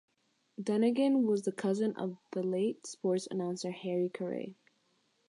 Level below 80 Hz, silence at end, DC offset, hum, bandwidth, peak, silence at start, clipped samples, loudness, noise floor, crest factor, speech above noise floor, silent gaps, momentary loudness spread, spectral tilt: -86 dBFS; 0.75 s; under 0.1%; none; 11.5 kHz; -18 dBFS; 0.6 s; under 0.1%; -33 LUFS; -74 dBFS; 14 dB; 42 dB; none; 11 LU; -6 dB/octave